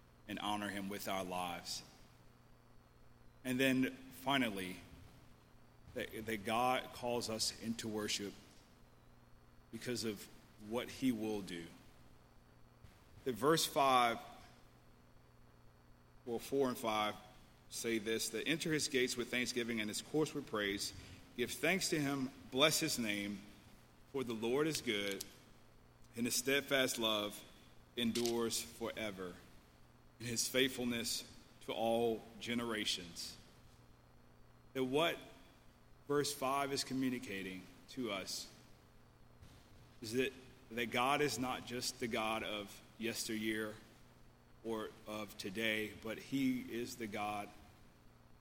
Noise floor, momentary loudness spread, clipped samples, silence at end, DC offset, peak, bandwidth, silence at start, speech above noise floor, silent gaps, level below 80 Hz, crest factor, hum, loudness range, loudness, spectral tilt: -64 dBFS; 15 LU; under 0.1%; 0.05 s; under 0.1%; -16 dBFS; 16.5 kHz; 0.25 s; 25 dB; none; -68 dBFS; 24 dB; none; 6 LU; -39 LUFS; -3 dB/octave